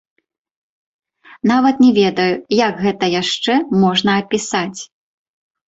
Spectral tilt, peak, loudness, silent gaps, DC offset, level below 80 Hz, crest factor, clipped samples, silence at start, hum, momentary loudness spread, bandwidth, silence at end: -5 dB/octave; -2 dBFS; -15 LUFS; none; under 0.1%; -58 dBFS; 14 dB; under 0.1%; 1.45 s; none; 9 LU; 8 kHz; 0.8 s